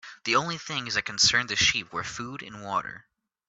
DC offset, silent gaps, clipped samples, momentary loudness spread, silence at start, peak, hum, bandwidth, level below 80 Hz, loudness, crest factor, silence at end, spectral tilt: under 0.1%; none; under 0.1%; 16 LU; 0.05 s; -8 dBFS; none; 8.4 kHz; -58 dBFS; -25 LUFS; 20 dB; 0.45 s; -1 dB/octave